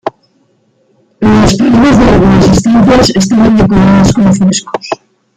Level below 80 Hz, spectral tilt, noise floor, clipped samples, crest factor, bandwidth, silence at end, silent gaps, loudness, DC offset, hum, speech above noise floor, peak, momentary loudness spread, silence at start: -24 dBFS; -6 dB/octave; -53 dBFS; under 0.1%; 8 dB; 11 kHz; 0.4 s; none; -7 LUFS; under 0.1%; none; 47 dB; 0 dBFS; 12 LU; 0.05 s